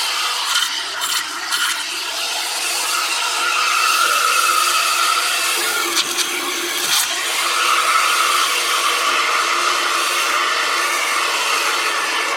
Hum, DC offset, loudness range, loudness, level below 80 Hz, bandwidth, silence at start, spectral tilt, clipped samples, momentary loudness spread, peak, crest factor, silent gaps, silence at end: none; under 0.1%; 2 LU; -16 LUFS; -66 dBFS; 16.5 kHz; 0 s; 2 dB/octave; under 0.1%; 5 LU; -4 dBFS; 14 dB; none; 0 s